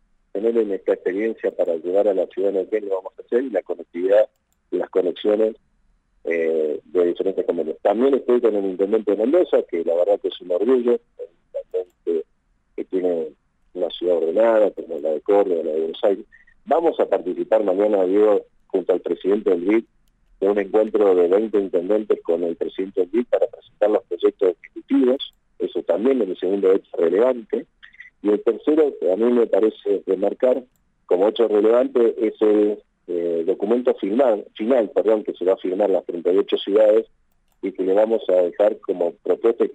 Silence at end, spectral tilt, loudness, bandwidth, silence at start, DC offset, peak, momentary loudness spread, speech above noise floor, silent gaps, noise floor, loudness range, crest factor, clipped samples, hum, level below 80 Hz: 0 s; -7.5 dB/octave; -20 LUFS; 8 kHz; 0.35 s; under 0.1%; -6 dBFS; 9 LU; 43 dB; none; -62 dBFS; 3 LU; 14 dB; under 0.1%; none; -64 dBFS